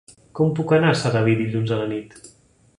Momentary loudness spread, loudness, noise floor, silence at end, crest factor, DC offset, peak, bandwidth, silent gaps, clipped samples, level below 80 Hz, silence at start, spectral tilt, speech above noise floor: 11 LU; -20 LUFS; -55 dBFS; 0.5 s; 18 dB; under 0.1%; -4 dBFS; 11 kHz; none; under 0.1%; -56 dBFS; 0.35 s; -6.5 dB/octave; 35 dB